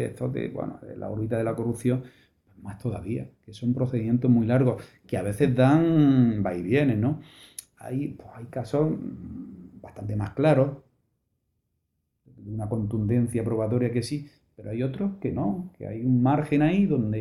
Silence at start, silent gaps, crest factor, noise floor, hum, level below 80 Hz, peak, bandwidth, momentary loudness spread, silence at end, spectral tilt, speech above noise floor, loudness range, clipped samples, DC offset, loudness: 0 s; none; 18 dB; -77 dBFS; none; -54 dBFS; -8 dBFS; 12.5 kHz; 18 LU; 0 s; -8.5 dB/octave; 52 dB; 8 LU; under 0.1%; under 0.1%; -26 LUFS